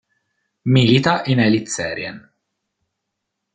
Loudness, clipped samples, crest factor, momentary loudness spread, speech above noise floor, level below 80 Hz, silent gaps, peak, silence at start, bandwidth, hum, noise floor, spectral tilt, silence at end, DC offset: -17 LUFS; under 0.1%; 18 dB; 14 LU; 62 dB; -56 dBFS; none; -2 dBFS; 0.65 s; 9.4 kHz; none; -78 dBFS; -5.5 dB/octave; 1.35 s; under 0.1%